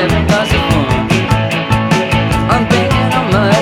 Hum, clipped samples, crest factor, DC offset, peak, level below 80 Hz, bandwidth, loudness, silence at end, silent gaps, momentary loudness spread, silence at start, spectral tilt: none; under 0.1%; 10 dB; under 0.1%; 0 dBFS; -26 dBFS; 16 kHz; -12 LUFS; 0 s; none; 2 LU; 0 s; -6 dB/octave